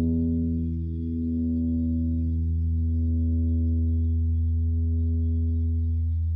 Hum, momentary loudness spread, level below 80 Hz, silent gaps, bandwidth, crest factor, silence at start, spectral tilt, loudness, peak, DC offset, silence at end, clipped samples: none; 3 LU; -28 dBFS; none; 0.7 kHz; 8 dB; 0 s; -14.5 dB/octave; -26 LUFS; -16 dBFS; under 0.1%; 0 s; under 0.1%